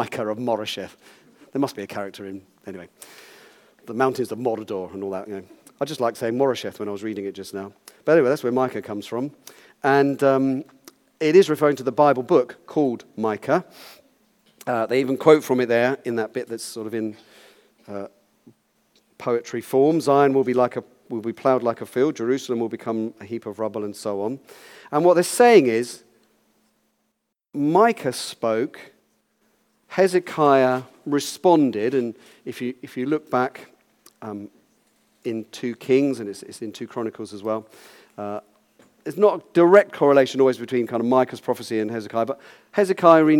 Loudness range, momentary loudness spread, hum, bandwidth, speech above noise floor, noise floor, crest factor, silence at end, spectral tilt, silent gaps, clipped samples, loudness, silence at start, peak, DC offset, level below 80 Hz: 9 LU; 18 LU; none; 17 kHz; 54 dB; -76 dBFS; 22 dB; 0 s; -5.5 dB/octave; none; under 0.1%; -22 LUFS; 0 s; 0 dBFS; under 0.1%; -76 dBFS